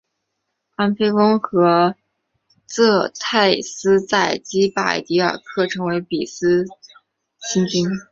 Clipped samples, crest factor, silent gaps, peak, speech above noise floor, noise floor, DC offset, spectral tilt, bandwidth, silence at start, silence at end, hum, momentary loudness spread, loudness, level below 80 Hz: under 0.1%; 18 dB; none; -2 dBFS; 58 dB; -76 dBFS; under 0.1%; -4.5 dB/octave; 8 kHz; 0.8 s; 0.1 s; none; 7 LU; -18 LUFS; -60 dBFS